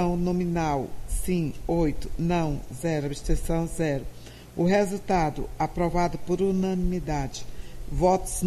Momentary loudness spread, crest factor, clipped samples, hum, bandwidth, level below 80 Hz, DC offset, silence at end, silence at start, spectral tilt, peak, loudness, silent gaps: 10 LU; 16 dB; under 0.1%; none; 14 kHz; -36 dBFS; under 0.1%; 0 s; 0 s; -6.5 dB/octave; -10 dBFS; -27 LUFS; none